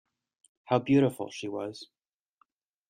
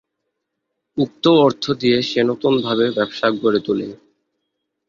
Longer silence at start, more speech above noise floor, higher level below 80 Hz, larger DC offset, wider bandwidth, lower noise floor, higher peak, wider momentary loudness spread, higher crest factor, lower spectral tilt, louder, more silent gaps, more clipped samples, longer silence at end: second, 0.7 s vs 0.95 s; second, 44 dB vs 60 dB; second, -70 dBFS vs -60 dBFS; neither; first, 15.5 kHz vs 7.4 kHz; second, -71 dBFS vs -77 dBFS; second, -10 dBFS vs -2 dBFS; first, 19 LU vs 9 LU; about the same, 22 dB vs 18 dB; about the same, -7 dB/octave vs -6 dB/octave; second, -29 LUFS vs -18 LUFS; neither; neither; about the same, 1.05 s vs 0.95 s